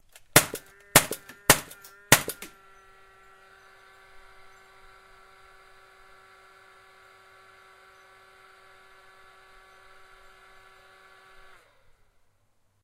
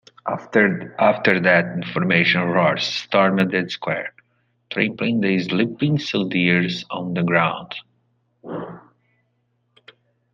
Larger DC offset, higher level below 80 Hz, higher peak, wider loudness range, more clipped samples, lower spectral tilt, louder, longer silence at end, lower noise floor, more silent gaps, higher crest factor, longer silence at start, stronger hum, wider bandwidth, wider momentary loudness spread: neither; first, -54 dBFS vs -62 dBFS; about the same, 0 dBFS vs -2 dBFS; first, 15 LU vs 7 LU; neither; second, -2 dB/octave vs -6.5 dB/octave; second, -22 LUFS vs -19 LUFS; first, 10.35 s vs 1.55 s; about the same, -67 dBFS vs -68 dBFS; neither; first, 32 dB vs 20 dB; about the same, 0.35 s vs 0.25 s; neither; first, 16 kHz vs 7.4 kHz; first, 23 LU vs 15 LU